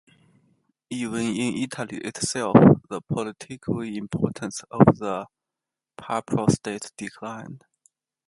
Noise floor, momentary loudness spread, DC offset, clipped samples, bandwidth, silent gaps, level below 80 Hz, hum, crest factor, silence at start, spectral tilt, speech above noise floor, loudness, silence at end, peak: -88 dBFS; 18 LU; under 0.1%; under 0.1%; 11.5 kHz; none; -54 dBFS; none; 24 dB; 0.9 s; -6 dB/octave; 65 dB; -23 LUFS; 0.7 s; 0 dBFS